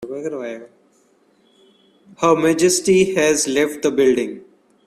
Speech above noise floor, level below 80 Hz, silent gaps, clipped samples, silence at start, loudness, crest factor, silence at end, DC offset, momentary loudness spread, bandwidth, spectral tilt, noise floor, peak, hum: 41 dB; -58 dBFS; none; under 0.1%; 0 s; -17 LUFS; 18 dB; 0.45 s; under 0.1%; 14 LU; 14.5 kHz; -4 dB/octave; -58 dBFS; 0 dBFS; none